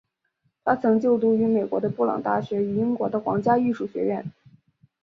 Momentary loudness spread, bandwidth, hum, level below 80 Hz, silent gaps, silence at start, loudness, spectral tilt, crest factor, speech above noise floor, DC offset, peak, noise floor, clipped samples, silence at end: 7 LU; 6.2 kHz; none; -64 dBFS; none; 0.65 s; -23 LUFS; -9.5 dB/octave; 18 dB; 50 dB; under 0.1%; -6 dBFS; -72 dBFS; under 0.1%; 0.75 s